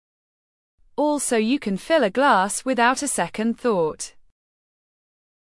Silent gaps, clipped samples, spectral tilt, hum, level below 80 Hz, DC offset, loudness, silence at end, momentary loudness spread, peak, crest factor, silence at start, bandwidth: none; under 0.1%; -3.5 dB/octave; none; -58 dBFS; under 0.1%; -21 LUFS; 1.4 s; 8 LU; -4 dBFS; 18 dB; 1 s; 12 kHz